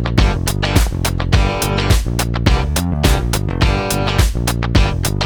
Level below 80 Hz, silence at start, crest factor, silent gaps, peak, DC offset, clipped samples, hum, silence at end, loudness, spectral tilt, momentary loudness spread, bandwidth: -18 dBFS; 0 s; 14 dB; none; 0 dBFS; 0.2%; under 0.1%; none; 0 s; -16 LUFS; -5 dB/octave; 3 LU; over 20 kHz